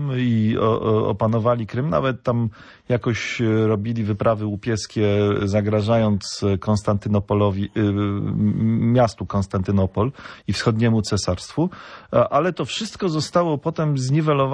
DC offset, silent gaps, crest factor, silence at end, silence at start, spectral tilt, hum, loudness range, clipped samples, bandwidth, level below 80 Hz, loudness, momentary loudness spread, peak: under 0.1%; none; 16 dB; 0 s; 0 s; -6.5 dB/octave; none; 1 LU; under 0.1%; 10.5 kHz; -48 dBFS; -21 LUFS; 6 LU; -4 dBFS